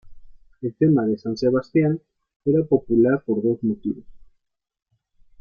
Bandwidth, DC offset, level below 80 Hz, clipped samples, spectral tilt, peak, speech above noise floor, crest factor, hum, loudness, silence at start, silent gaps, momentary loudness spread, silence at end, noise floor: 6.6 kHz; under 0.1%; -54 dBFS; under 0.1%; -9.5 dB/octave; -6 dBFS; 52 dB; 18 dB; none; -22 LUFS; 0.05 s; 2.36-2.40 s; 12 LU; 1.25 s; -73 dBFS